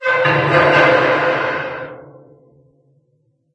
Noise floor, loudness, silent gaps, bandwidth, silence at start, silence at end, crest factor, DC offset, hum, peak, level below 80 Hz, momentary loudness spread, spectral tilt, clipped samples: -62 dBFS; -14 LUFS; none; 8.6 kHz; 0 s; 1.5 s; 18 dB; under 0.1%; none; 0 dBFS; -56 dBFS; 16 LU; -6 dB/octave; under 0.1%